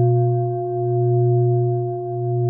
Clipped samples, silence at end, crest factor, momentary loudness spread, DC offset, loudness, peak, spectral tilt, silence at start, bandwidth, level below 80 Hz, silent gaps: under 0.1%; 0 s; 10 dB; 6 LU; under 0.1%; -20 LUFS; -8 dBFS; -18 dB/octave; 0 s; 1.6 kHz; -68 dBFS; none